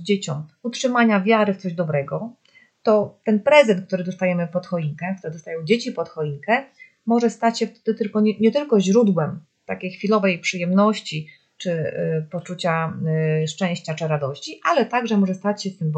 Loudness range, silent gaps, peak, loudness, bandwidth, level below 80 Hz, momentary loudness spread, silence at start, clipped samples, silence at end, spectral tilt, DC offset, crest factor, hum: 4 LU; none; 0 dBFS; -21 LUFS; 8.8 kHz; -72 dBFS; 12 LU; 0 s; under 0.1%; 0 s; -6 dB/octave; under 0.1%; 20 dB; none